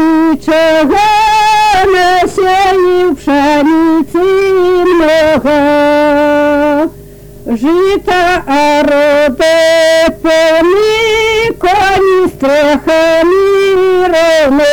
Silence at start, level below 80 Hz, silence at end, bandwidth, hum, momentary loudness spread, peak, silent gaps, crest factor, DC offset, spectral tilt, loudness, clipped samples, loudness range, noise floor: 0 s; -34 dBFS; 0 s; 19.5 kHz; none; 3 LU; -4 dBFS; none; 4 dB; under 0.1%; -4 dB/octave; -8 LUFS; under 0.1%; 2 LU; -31 dBFS